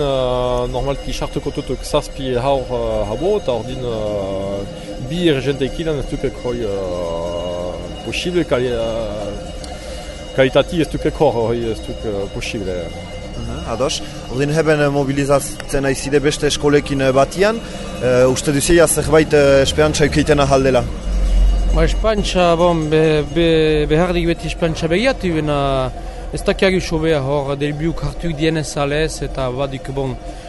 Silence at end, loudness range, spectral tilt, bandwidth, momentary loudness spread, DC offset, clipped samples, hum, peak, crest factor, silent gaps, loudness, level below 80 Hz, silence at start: 0 s; 7 LU; -5 dB/octave; 12 kHz; 11 LU; under 0.1%; under 0.1%; none; 0 dBFS; 16 dB; none; -17 LUFS; -26 dBFS; 0 s